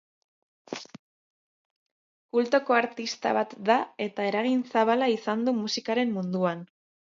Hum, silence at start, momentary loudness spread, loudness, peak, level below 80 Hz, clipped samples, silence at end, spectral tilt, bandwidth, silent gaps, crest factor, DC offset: none; 0.7 s; 10 LU; -26 LUFS; -8 dBFS; -80 dBFS; under 0.1%; 0.45 s; -5 dB/octave; 7.6 kHz; 0.99-2.29 s; 20 dB; under 0.1%